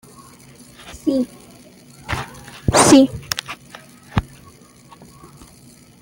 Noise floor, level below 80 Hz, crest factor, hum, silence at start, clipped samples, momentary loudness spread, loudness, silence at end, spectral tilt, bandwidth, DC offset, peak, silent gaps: -46 dBFS; -40 dBFS; 22 dB; none; 0.85 s; under 0.1%; 28 LU; -18 LUFS; 1.8 s; -4 dB/octave; 17 kHz; under 0.1%; 0 dBFS; none